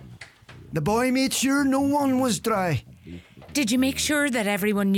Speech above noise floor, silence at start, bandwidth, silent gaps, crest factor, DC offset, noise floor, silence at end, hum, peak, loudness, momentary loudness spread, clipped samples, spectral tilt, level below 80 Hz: 24 dB; 0 s; 18 kHz; none; 14 dB; under 0.1%; -46 dBFS; 0 s; none; -10 dBFS; -23 LUFS; 11 LU; under 0.1%; -4 dB/octave; -54 dBFS